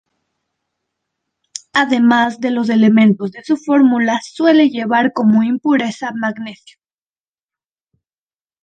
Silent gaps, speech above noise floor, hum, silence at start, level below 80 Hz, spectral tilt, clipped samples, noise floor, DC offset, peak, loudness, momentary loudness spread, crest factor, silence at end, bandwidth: none; over 76 dB; none; 1.75 s; -64 dBFS; -5.5 dB/octave; under 0.1%; under -90 dBFS; under 0.1%; 0 dBFS; -14 LUFS; 10 LU; 16 dB; 2.1 s; 9 kHz